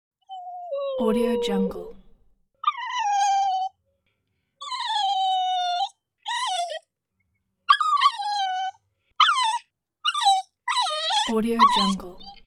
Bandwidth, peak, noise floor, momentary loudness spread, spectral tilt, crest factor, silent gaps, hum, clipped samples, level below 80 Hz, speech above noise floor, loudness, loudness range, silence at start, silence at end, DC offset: 15.5 kHz; -4 dBFS; -76 dBFS; 17 LU; -3 dB/octave; 22 dB; none; none; under 0.1%; -56 dBFS; 54 dB; -23 LUFS; 5 LU; 0.3 s; 0.1 s; under 0.1%